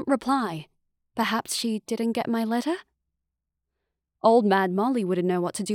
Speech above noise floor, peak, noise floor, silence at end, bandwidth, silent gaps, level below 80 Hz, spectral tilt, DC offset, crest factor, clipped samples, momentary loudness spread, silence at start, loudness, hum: 59 dB; -8 dBFS; -84 dBFS; 0 s; 18 kHz; none; -70 dBFS; -5 dB/octave; under 0.1%; 18 dB; under 0.1%; 11 LU; 0 s; -25 LUFS; none